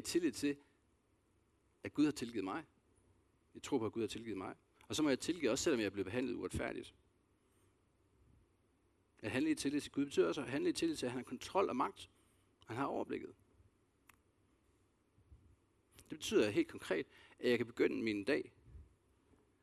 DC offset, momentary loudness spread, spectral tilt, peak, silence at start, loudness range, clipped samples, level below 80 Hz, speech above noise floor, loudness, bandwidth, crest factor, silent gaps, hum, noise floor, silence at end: under 0.1%; 14 LU; -4.5 dB/octave; -20 dBFS; 0 s; 10 LU; under 0.1%; -70 dBFS; 38 dB; -39 LUFS; 13.5 kHz; 20 dB; none; none; -76 dBFS; 0.8 s